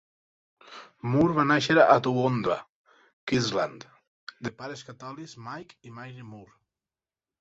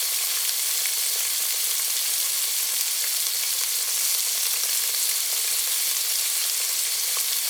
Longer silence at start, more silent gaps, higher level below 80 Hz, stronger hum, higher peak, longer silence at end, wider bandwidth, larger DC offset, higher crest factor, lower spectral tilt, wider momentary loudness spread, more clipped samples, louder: first, 0.7 s vs 0 s; first, 2.69-2.85 s, 3.13-3.27 s, 4.07-4.27 s vs none; first, -62 dBFS vs under -90 dBFS; neither; about the same, -4 dBFS vs -4 dBFS; first, 0.95 s vs 0 s; second, 8 kHz vs over 20 kHz; neither; about the same, 24 dB vs 22 dB; first, -6 dB/octave vs 8.5 dB/octave; first, 26 LU vs 1 LU; neither; second, -24 LUFS vs -21 LUFS